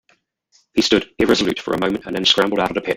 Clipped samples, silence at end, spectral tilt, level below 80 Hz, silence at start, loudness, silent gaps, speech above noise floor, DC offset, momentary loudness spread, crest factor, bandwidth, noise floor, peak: under 0.1%; 0 s; -4 dB/octave; -48 dBFS; 0.75 s; -18 LUFS; none; 44 dB; under 0.1%; 6 LU; 18 dB; 16.5 kHz; -62 dBFS; 0 dBFS